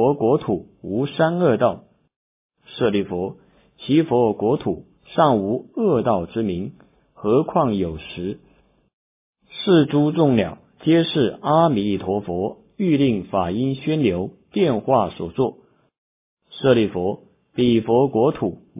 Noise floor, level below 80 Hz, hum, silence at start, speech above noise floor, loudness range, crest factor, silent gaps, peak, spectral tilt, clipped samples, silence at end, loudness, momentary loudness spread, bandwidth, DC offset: -58 dBFS; -50 dBFS; none; 0 s; 39 dB; 4 LU; 18 dB; 2.16-2.50 s, 8.93-9.33 s, 15.98-16.37 s; -2 dBFS; -11.5 dB/octave; under 0.1%; 0 s; -20 LUFS; 12 LU; 3.9 kHz; under 0.1%